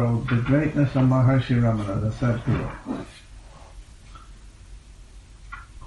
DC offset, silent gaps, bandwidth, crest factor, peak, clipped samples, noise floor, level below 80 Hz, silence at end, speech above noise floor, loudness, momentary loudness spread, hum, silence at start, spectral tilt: under 0.1%; none; 10 kHz; 16 dB; -8 dBFS; under 0.1%; -45 dBFS; -42 dBFS; 0 s; 24 dB; -23 LUFS; 20 LU; none; 0 s; -8.5 dB/octave